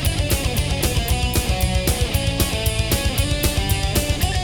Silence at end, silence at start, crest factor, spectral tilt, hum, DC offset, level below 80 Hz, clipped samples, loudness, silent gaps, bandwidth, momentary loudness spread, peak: 0 s; 0 s; 16 dB; -4 dB/octave; none; under 0.1%; -24 dBFS; under 0.1%; -20 LUFS; none; over 20 kHz; 1 LU; -4 dBFS